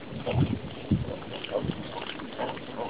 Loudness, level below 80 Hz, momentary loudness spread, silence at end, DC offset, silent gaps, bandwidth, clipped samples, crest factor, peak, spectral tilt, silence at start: -32 LUFS; -46 dBFS; 8 LU; 0 s; 0.4%; none; 4 kHz; under 0.1%; 20 dB; -12 dBFS; -5.5 dB/octave; 0 s